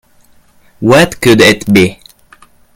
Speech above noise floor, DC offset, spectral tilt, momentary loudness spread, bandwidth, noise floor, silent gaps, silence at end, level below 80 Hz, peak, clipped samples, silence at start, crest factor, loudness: 38 dB; under 0.1%; -5 dB/octave; 7 LU; 19.5 kHz; -46 dBFS; none; 0.85 s; -40 dBFS; 0 dBFS; 1%; 0.8 s; 12 dB; -8 LUFS